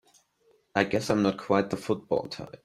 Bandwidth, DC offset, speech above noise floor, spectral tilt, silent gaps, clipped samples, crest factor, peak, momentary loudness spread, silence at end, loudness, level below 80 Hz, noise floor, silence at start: 14 kHz; under 0.1%; 39 dB; -5.5 dB/octave; none; under 0.1%; 20 dB; -8 dBFS; 6 LU; 0.1 s; -28 LUFS; -62 dBFS; -67 dBFS; 0.75 s